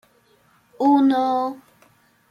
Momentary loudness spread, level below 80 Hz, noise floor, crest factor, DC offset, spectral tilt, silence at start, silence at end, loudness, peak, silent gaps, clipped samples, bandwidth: 13 LU; -74 dBFS; -59 dBFS; 16 dB; under 0.1%; -6 dB/octave; 0.8 s; 0.75 s; -19 LUFS; -6 dBFS; none; under 0.1%; 6.8 kHz